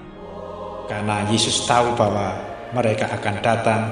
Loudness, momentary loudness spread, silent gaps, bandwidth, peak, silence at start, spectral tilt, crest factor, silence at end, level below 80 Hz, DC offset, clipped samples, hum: -20 LUFS; 15 LU; none; 12 kHz; -2 dBFS; 0 s; -4 dB/octave; 20 dB; 0 s; -50 dBFS; under 0.1%; under 0.1%; none